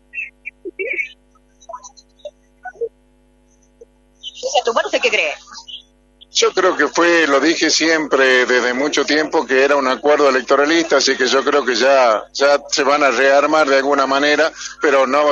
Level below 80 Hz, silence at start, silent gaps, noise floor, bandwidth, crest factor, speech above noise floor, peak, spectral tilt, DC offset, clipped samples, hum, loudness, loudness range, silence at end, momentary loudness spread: -58 dBFS; 0.15 s; none; -54 dBFS; 8.2 kHz; 16 dB; 40 dB; 0 dBFS; -1.5 dB/octave; under 0.1%; under 0.1%; none; -14 LUFS; 15 LU; 0 s; 17 LU